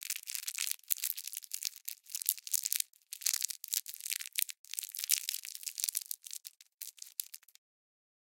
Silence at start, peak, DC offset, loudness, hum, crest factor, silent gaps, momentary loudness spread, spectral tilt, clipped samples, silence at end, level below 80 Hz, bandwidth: 0 s; -2 dBFS; under 0.1%; -36 LUFS; none; 36 dB; 4.58-4.64 s, 6.74-6.78 s; 13 LU; 9.5 dB/octave; under 0.1%; 0.9 s; under -90 dBFS; 17 kHz